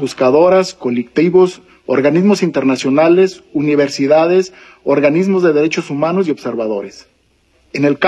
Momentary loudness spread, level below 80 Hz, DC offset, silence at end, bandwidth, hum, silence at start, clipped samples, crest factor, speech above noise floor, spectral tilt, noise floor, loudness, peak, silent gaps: 9 LU; -58 dBFS; under 0.1%; 0 s; 10 kHz; none; 0 s; under 0.1%; 12 dB; 43 dB; -6.5 dB/octave; -56 dBFS; -13 LUFS; 0 dBFS; none